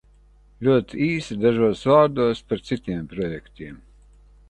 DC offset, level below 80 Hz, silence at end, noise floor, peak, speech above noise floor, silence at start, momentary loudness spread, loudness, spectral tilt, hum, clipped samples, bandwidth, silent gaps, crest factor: under 0.1%; -50 dBFS; 0.75 s; -53 dBFS; -4 dBFS; 32 dB; 0.6 s; 17 LU; -22 LUFS; -7 dB/octave; 50 Hz at -45 dBFS; under 0.1%; 10.5 kHz; none; 20 dB